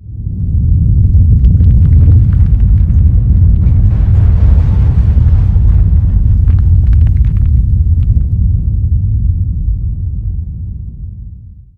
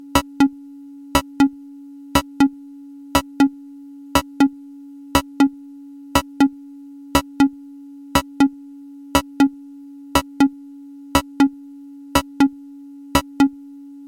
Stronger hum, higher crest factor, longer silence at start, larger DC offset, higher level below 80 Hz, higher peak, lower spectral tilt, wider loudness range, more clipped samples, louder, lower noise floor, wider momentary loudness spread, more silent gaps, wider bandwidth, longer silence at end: neither; second, 8 dB vs 20 dB; second, 0 s vs 0.15 s; first, 0.9% vs under 0.1%; first, -10 dBFS vs -40 dBFS; about the same, 0 dBFS vs -2 dBFS; first, -11.5 dB/octave vs -4.5 dB/octave; first, 6 LU vs 0 LU; neither; first, -10 LUFS vs -20 LUFS; second, -31 dBFS vs -39 dBFS; second, 11 LU vs 22 LU; neither; second, 2.3 kHz vs 17 kHz; second, 0.25 s vs 0.5 s